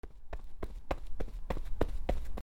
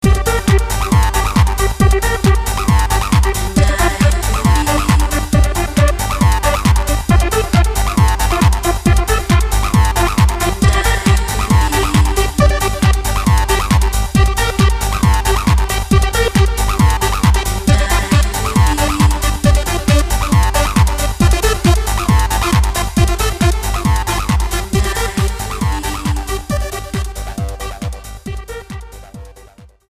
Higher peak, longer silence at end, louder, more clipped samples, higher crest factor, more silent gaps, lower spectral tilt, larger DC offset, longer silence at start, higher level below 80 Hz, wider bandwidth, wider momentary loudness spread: second, -12 dBFS vs 0 dBFS; second, 0 s vs 0.25 s; second, -42 LUFS vs -14 LUFS; neither; first, 20 dB vs 14 dB; neither; first, -7 dB/octave vs -5 dB/octave; neither; about the same, 0.05 s vs 0 s; second, -38 dBFS vs -16 dBFS; second, 7.8 kHz vs 15.5 kHz; first, 12 LU vs 7 LU